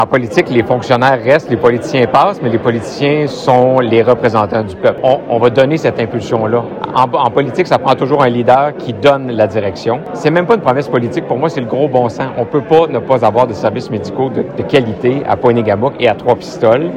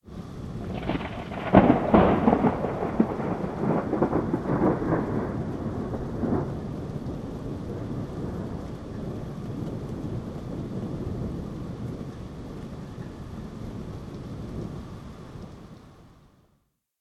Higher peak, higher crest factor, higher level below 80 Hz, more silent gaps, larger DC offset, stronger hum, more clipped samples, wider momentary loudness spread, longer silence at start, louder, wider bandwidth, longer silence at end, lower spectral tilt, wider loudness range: about the same, 0 dBFS vs -2 dBFS; second, 12 dB vs 26 dB; about the same, -48 dBFS vs -44 dBFS; neither; neither; neither; first, 0.3% vs under 0.1%; second, 6 LU vs 18 LU; about the same, 0 s vs 0.05 s; first, -12 LUFS vs -28 LUFS; second, 10 kHz vs 12.5 kHz; second, 0 s vs 0.9 s; second, -7 dB/octave vs -8.5 dB/octave; second, 2 LU vs 15 LU